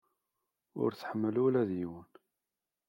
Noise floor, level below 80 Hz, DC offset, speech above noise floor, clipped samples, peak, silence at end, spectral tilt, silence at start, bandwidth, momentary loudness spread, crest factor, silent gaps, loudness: under -90 dBFS; -78 dBFS; under 0.1%; over 58 dB; under 0.1%; -18 dBFS; 0.85 s; -9 dB/octave; 0.75 s; 16.5 kHz; 16 LU; 18 dB; none; -33 LUFS